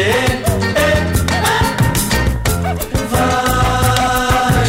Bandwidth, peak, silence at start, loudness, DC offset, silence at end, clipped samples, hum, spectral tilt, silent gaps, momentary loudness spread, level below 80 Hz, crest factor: 16.5 kHz; -2 dBFS; 0 s; -15 LUFS; under 0.1%; 0 s; under 0.1%; none; -4.5 dB/octave; none; 4 LU; -24 dBFS; 12 dB